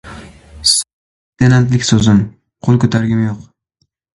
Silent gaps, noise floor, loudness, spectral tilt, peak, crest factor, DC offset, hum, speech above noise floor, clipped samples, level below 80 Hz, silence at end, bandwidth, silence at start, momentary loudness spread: 0.93-1.33 s; -65 dBFS; -13 LUFS; -5 dB/octave; 0 dBFS; 14 dB; under 0.1%; none; 54 dB; under 0.1%; -40 dBFS; 0.75 s; 11.5 kHz; 0.05 s; 15 LU